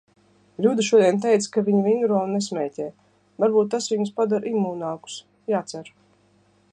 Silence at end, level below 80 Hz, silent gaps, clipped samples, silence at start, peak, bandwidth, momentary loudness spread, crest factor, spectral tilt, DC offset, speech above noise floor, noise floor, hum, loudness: 0.85 s; -72 dBFS; none; under 0.1%; 0.6 s; -6 dBFS; 10 kHz; 17 LU; 18 dB; -5.5 dB/octave; under 0.1%; 39 dB; -60 dBFS; 50 Hz at -40 dBFS; -22 LUFS